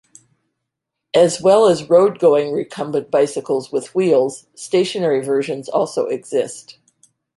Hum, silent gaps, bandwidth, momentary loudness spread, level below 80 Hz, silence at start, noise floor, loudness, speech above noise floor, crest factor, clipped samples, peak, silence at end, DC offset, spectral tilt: none; none; 11.5 kHz; 10 LU; -64 dBFS; 1.15 s; -80 dBFS; -17 LUFS; 63 dB; 16 dB; under 0.1%; -2 dBFS; 0.75 s; under 0.1%; -5 dB/octave